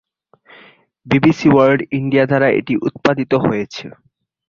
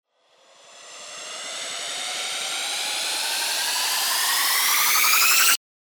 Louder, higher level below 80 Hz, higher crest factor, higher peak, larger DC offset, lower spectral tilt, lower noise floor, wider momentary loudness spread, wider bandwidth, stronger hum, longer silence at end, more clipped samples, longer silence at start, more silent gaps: first, -15 LUFS vs -20 LUFS; first, -50 dBFS vs -74 dBFS; about the same, 16 dB vs 20 dB; about the same, -2 dBFS vs -4 dBFS; neither; first, -7.5 dB/octave vs 3.5 dB/octave; second, -51 dBFS vs -58 dBFS; second, 11 LU vs 16 LU; second, 7.2 kHz vs over 20 kHz; neither; first, 0.6 s vs 0.3 s; neither; first, 1.05 s vs 0.7 s; neither